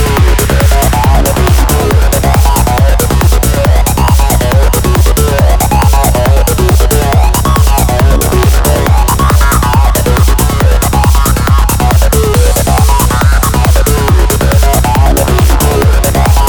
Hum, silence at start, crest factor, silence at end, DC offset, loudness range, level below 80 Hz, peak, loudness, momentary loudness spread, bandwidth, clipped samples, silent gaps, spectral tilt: none; 0 s; 6 dB; 0 s; under 0.1%; 0 LU; -10 dBFS; 0 dBFS; -9 LUFS; 1 LU; over 20 kHz; 0.1%; none; -5 dB/octave